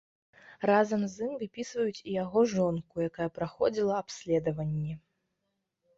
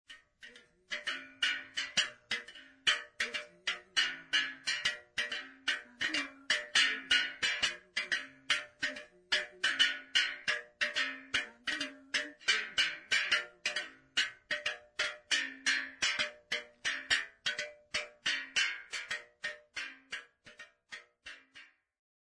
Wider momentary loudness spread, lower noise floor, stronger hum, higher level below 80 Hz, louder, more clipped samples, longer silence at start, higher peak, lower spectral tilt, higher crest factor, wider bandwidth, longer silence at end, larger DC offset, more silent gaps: second, 10 LU vs 13 LU; first, -82 dBFS vs -59 dBFS; neither; first, -64 dBFS vs -74 dBFS; about the same, -31 LUFS vs -33 LUFS; neither; first, 0.5 s vs 0.1 s; about the same, -12 dBFS vs -14 dBFS; first, -6.5 dB/octave vs 1 dB/octave; about the same, 18 dB vs 22 dB; second, 8 kHz vs 11 kHz; first, 1 s vs 0.7 s; neither; neither